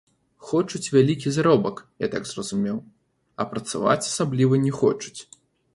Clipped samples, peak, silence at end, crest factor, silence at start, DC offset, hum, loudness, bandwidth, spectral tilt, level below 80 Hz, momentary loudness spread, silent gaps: under 0.1%; -4 dBFS; 0.5 s; 18 dB; 0.4 s; under 0.1%; none; -23 LUFS; 11.5 kHz; -5.5 dB/octave; -60 dBFS; 12 LU; none